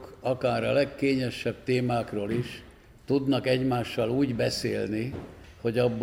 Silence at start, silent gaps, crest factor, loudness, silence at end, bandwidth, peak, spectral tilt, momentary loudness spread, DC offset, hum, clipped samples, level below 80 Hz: 0 s; none; 18 dB; -28 LUFS; 0 s; 16.5 kHz; -10 dBFS; -6.5 dB/octave; 8 LU; under 0.1%; none; under 0.1%; -54 dBFS